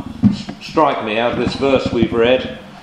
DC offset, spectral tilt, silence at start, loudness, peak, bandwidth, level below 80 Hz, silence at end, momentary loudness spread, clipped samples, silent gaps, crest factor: under 0.1%; -6.5 dB/octave; 0 s; -17 LUFS; 0 dBFS; 10 kHz; -40 dBFS; 0 s; 5 LU; under 0.1%; none; 16 dB